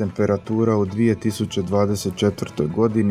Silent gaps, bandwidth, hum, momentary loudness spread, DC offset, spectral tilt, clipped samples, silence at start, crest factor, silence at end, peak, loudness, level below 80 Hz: none; 15 kHz; none; 4 LU; under 0.1%; -7 dB/octave; under 0.1%; 0 s; 16 dB; 0 s; -4 dBFS; -21 LUFS; -52 dBFS